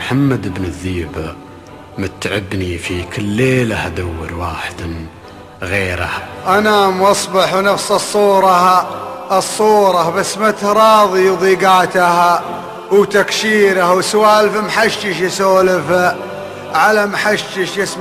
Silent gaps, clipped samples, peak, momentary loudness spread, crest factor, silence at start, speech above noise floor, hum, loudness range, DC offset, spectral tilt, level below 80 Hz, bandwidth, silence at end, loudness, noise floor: none; under 0.1%; 0 dBFS; 14 LU; 14 dB; 0 s; 22 dB; none; 8 LU; under 0.1%; -4.5 dB/octave; -38 dBFS; 15 kHz; 0 s; -13 LUFS; -35 dBFS